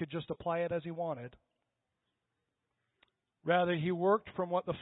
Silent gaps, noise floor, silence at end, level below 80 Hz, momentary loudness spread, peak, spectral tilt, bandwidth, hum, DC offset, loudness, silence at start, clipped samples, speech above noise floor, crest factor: none; -86 dBFS; 0 s; -70 dBFS; 11 LU; -16 dBFS; -3.5 dB/octave; 3.9 kHz; none; under 0.1%; -34 LUFS; 0 s; under 0.1%; 52 dB; 20 dB